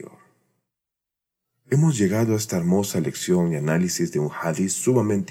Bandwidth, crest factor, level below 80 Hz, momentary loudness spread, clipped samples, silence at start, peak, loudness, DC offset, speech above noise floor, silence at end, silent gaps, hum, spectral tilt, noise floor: 16.5 kHz; 16 dB; -62 dBFS; 5 LU; under 0.1%; 0 s; -8 dBFS; -22 LUFS; under 0.1%; 65 dB; 0 s; none; none; -6 dB/octave; -86 dBFS